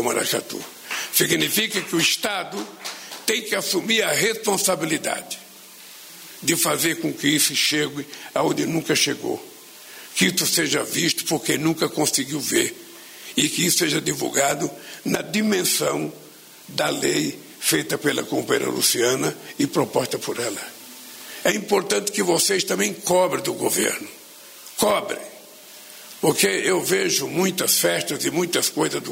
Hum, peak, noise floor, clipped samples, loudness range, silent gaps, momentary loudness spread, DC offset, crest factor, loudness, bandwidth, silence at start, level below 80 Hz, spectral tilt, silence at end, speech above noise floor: none; -4 dBFS; -44 dBFS; under 0.1%; 2 LU; none; 17 LU; under 0.1%; 20 dB; -21 LUFS; 16.5 kHz; 0 s; -64 dBFS; -2.5 dB/octave; 0 s; 22 dB